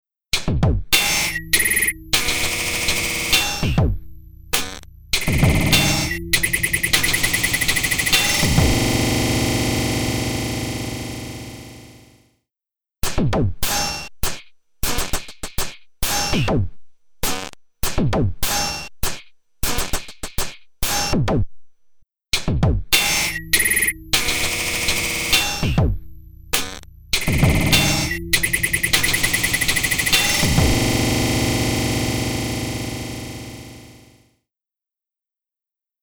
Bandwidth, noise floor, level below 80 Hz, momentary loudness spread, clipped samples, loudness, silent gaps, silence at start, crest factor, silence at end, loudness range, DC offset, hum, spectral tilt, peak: over 20 kHz; -89 dBFS; -30 dBFS; 13 LU; under 0.1%; -19 LUFS; none; 0.35 s; 20 dB; 2.05 s; 8 LU; under 0.1%; none; -3 dB/octave; 0 dBFS